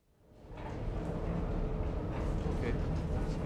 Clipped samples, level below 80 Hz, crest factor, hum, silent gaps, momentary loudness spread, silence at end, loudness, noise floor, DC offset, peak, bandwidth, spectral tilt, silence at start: under 0.1%; -38 dBFS; 12 dB; none; none; 7 LU; 0 s; -37 LUFS; -58 dBFS; under 0.1%; -22 dBFS; 9.6 kHz; -8 dB/octave; 0.35 s